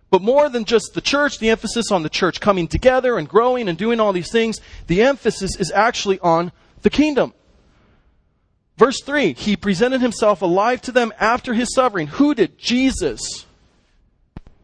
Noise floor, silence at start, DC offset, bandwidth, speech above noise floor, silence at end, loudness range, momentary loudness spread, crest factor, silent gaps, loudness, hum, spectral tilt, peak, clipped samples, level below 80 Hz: -63 dBFS; 0.1 s; under 0.1%; 10.5 kHz; 46 dB; 0.25 s; 3 LU; 6 LU; 18 dB; none; -18 LUFS; none; -4.5 dB/octave; 0 dBFS; under 0.1%; -42 dBFS